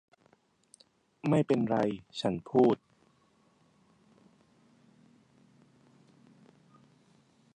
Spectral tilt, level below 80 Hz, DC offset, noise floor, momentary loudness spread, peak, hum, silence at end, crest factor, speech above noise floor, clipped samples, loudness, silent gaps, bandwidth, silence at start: -7.5 dB/octave; -72 dBFS; under 0.1%; -68 dBFS; 9 LU; -12 dBFS; none; 4.8 s; 24 dB; 40 dB; under 0.1%; -30 LUFS; none; 10 kHz; 1.25 s